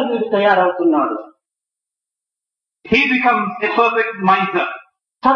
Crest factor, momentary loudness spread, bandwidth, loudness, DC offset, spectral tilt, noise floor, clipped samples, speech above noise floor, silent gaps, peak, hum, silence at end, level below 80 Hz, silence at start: 16 dB; 8 LU; 7 kHz; -16 LUFS; under 0.1%; -6.5 dB/octave; -86 dBFS; under 0.1%; 71 dB; none; 0 dBFS; none; 0 s; -54 dBFS; 0 s